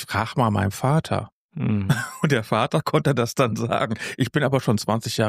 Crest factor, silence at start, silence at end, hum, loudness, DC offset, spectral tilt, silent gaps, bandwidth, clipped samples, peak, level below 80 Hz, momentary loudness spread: 16 dB; 0 s; 0 s; none; -23 LUFS; under 0.1%; -6 dB/octave; 1.32-1.49 s; 15.5 kHz; under 0.1%; -6 dBFS; -56 dBFS; 5 LU